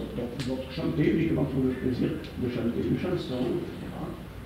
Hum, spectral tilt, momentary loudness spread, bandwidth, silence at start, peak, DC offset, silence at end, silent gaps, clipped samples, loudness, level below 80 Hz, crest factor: none; -7.5 dB/octave; 11 LU; 16 kHz; 0 s; -12 dBFS; under 0.1%; 0 s; none; under 0.1%; -29 LUFS; -46 dBFS; 16 dB